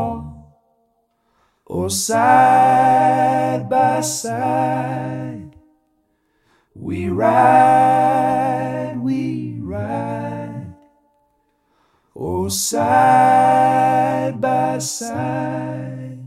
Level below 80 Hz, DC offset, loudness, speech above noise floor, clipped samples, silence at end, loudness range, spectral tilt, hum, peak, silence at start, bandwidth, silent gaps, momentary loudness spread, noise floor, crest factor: -54 dBFS; under 0.1%; -17 LUFS; 50 dB; under 0.1%; 0 s; 10 LU; -5 dB/octave; none; 0 dBFS; 0 s; 16 kHz; none; 17 LU; -65 dBFS; 18 dB